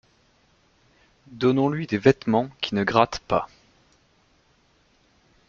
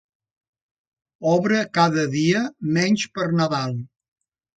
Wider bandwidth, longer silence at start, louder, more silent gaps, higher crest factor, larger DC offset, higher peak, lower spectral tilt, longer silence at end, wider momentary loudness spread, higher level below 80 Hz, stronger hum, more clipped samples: second, 7.4 kHz vs 9.2 kHz; about the same, 1.3 s vs 1.2 s; about the same, -23 LUFS vs -21 LUFS; neither; first, 24 dB vs 18 dB; neither; about the same, -2 dBFS vs -4 dBFS; about the same, -6.5 dB/octave vs -5.5 dB/octave; first, 2.05 s vs 0.7 s; about the same, 6 LU vs 7 LU; first, -56 dBFS vs -64 dBFS; neither; neither